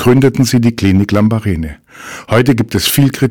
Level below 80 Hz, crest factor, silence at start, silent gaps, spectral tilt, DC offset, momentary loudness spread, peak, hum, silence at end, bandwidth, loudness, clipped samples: -34 dBFS; 10 dB; 0 s; none; -6 dB/octave; under 0.1%; 16 LU; -2 dBFS; none; 0 s; 19 kHz; -12 LUFS; under 0.1%